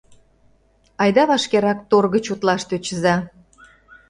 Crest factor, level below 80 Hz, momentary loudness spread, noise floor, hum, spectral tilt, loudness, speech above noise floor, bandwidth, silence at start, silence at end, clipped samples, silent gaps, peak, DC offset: 18 dB; -56 dBFS; 7 LU; -58 dBFS; none; -5 dB/octave; -19 LUFS; 40 dB; 11 kHz; 1 s; 0.8 s; under 0.1%; none; -2 dBFS; under 0.1%